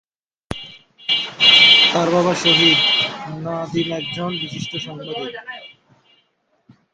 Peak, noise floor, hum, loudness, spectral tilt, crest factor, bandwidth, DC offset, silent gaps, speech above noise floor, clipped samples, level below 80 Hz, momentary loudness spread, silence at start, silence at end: 0 dBFS; -65 dBFS; none; -14 LUFS; -3.5 dB/octave; 20 dB; 11 kHz; under 0.1%; none; 47 dB; under 0.1%; -54 dBFS; 23 LU; 0.5 s; 1.25 s